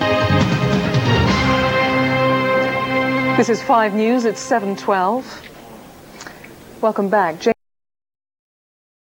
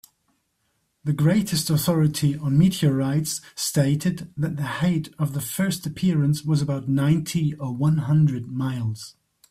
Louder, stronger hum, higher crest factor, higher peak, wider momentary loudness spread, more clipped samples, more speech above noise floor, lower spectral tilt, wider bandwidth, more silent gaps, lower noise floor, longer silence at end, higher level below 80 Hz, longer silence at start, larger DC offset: first, -17 LUFS vs -23 LUFS; neither; about the same, 16 dB vs 14 dB; first, -2 dBFS vs -8 dBFS; first, 12 LU vs 8 LU; neither; second, 22 dB vs 49 dB; about the same, -6 dB/octave vs -6 dB/octave; first, 17.5 kHz vs 15.5 kHz; neither; second, -39 dBFS vs -71 dBFS; first, 1.5 s vs 0.4 s; first, -40 dBFS vs -54 dBFS; second, 0 s vs 1.05 s; neither